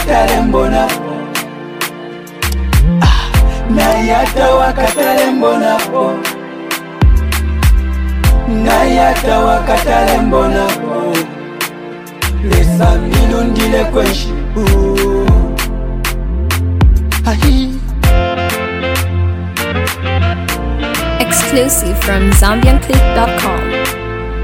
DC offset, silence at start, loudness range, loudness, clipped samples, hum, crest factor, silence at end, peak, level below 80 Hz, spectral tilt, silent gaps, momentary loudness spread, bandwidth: under 0.1%; 0 s; 3 LU; -13 LUFS; under 0.1%; none; 12 dB; 0 s; 0 dBFS; -16 dBFS; -5 dB/octave; none; 9 LU; 17 kHz